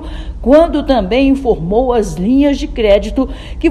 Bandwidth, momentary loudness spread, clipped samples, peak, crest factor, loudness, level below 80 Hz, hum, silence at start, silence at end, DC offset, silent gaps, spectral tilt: 12 kHz; 9 LU; 0.4%; 0 dBFS; 12 dB; -13 LUFS; -24 dBFS; none; 0 s; 0 s; under 0.1%; none; -6.5 dB/octave